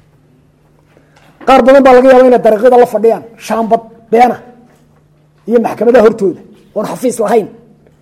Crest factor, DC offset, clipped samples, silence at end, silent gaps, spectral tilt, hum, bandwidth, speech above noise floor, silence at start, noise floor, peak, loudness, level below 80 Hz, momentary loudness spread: 10 dB; under 0.1%; 0.9%; 0.55 s; none; -5.5 dB/octave; none; 14.5 kHz; 40 dB; 1.4 s; -48 dBFS; 0 dBFS; -9 LUFS; -44 dBFS; 15 LU